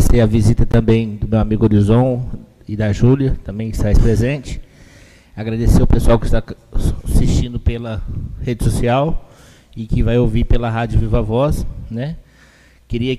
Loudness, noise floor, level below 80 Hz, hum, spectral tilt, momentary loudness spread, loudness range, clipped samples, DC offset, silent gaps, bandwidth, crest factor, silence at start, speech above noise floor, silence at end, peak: -17 LUFS; -47 dBFS; -20 dBFS; none; -7.5 dB/octave; 14 LU; 4 LU; under 0.1%; under 0.1%; none; 13.5 kHz; 12 dB; 0 s; 33 dB; 0 s; -2 dBFS